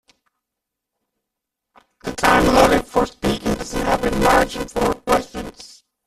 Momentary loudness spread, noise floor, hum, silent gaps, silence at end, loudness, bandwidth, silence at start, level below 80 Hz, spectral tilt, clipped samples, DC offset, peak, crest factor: 17 LU; -82 dBFS; none; none; 0.4 s; -18 LUFS; 15 kHz; 2.05 s; -36 dBFS; -4.5 dB/octave; under 0.1%; under 0.1%; 0 dBFS; 20 dB